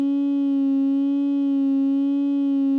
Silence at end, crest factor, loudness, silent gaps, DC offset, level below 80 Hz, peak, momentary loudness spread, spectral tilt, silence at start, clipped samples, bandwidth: 0 s; 4 dB; -21 LUFS; none; under 0.1%; under -90 dBFS; -16 dBFS; 1 LU; -7.5 dB/octave; 0 s; under 0.1%; 3.8 kHz